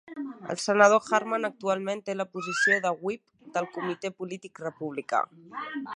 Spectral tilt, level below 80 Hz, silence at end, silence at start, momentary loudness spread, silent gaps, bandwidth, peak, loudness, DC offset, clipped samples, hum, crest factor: -4 dB/octave; -80 dBFS; 0 s; 0.05 s; 17 LU; none; 11 kHz; -4 dBFS; -27 LUFS; under 0.1%; under 0.1%; none; 24 dB